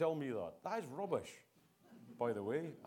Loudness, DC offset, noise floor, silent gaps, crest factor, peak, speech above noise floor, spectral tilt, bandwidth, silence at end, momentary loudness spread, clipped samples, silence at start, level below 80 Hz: -42 LUFS; under 0.1%; -65 dBFS; none; 20 dB; -22 dBFS; 24 dB; -6.5 dB/octave; 17.5 kHz; 0 s; 20 LU; under 0.1%; 0 s; -82 dBFS